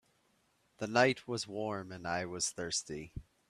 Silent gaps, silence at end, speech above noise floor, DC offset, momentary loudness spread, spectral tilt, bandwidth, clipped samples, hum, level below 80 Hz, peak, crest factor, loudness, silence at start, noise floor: none; 0.25 s; 39 dB; under 0.1%; 15 LU; -3 dB/octave; 14.5 kHz; under 0.1%; none; -62 dBFS; -12 dBFS; 24 dB; -35 LUFS; 0.8 s; -74 dBFS